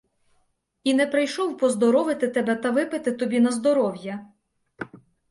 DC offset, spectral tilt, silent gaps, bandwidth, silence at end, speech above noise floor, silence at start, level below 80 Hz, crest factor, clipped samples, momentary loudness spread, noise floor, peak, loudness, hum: under 0.1%; -4.5 dB/octave; none; 11.5 kHz; 0.35 s; 47 dB; 0.85 s; -70 dBFS; 16 dB; under 0.1%; 17 LU; -69 dBFS; -8 dBFS; -23 LUFS; none